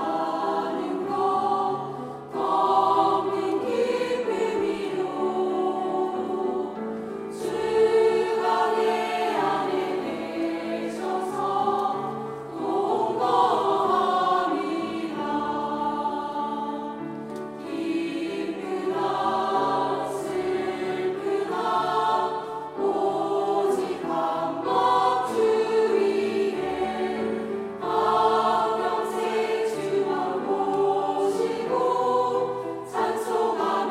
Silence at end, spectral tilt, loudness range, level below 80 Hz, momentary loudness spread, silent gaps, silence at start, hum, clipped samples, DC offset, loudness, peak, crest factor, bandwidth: 0 s; -5 dB/octave; 4 LU; -64 dBFS; 9 LU; none; 0 s; none; under 0.1%; under 0.1%; -25 LUFS; -8 dBFS; 16 dB; 14 kHz